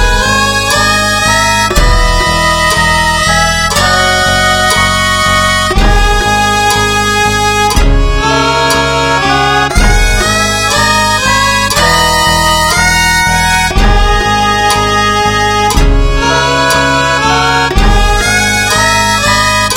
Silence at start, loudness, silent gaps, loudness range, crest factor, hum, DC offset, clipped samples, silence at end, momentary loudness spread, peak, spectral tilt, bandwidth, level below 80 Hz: 0 s; -8 LUFS; none; 1 LU; 8 dB; none; under 0.1%; 0.4%; 0 s; 2 LU; 0 dBFS; -3 dB/octave; 17 kHz; -16 dBFS